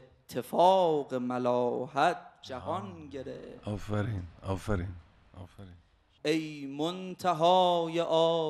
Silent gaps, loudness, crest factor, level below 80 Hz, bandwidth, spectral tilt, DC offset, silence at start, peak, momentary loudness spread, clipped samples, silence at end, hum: none; -30 LUFS; 18 dB; -54 dBFS; 13.5 kHz; -6 dB/octave; under 0.1%; 0.3 s; -12 dBFS; 18 LU; under 0.1%; 0 s; none